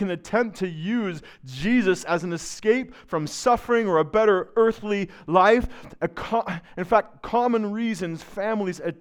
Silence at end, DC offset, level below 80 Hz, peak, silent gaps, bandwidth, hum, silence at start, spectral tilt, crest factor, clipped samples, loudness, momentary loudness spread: 0.05 s; under 0.1%; -48 dBFS; -4 dBFS; none; 14 kHz; none; 0 s; -5.5 dB/octave; 20 dB; under 0.1%; -24 LUFS; 11 LU